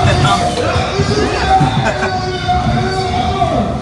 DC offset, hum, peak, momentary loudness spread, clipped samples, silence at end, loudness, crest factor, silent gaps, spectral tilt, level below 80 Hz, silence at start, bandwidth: under 0.1%; none; -2 dBFS; 4 LU; under 0.1%; 0 s; -14 LUFS; 12 dB; none; -5.5 dB/octave; -28 dBFS; 0 s; 11.5 kHz